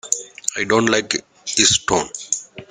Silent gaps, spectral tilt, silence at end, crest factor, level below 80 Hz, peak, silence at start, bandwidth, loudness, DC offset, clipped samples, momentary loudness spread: none; -1.5 dB/octave; 0.05 s; 20 dB; -52 dBFS; 0 dBFS; 0.05 s; 13.5 kHz; -18 LUFS; under 0.1%; under 0.1%; 10 LU